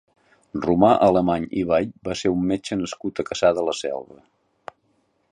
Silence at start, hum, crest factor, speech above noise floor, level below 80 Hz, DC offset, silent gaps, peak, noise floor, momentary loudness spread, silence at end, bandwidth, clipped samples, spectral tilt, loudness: 0.55 s; none; 20 dB; 46 dB; -50 dBFS; under 0.1%; none; -4 dBFS; -67 dBFS; 12 LU; 1.15 s; 10.5 kHz; under 0.1%; -6 dB/octave; -22 LUFS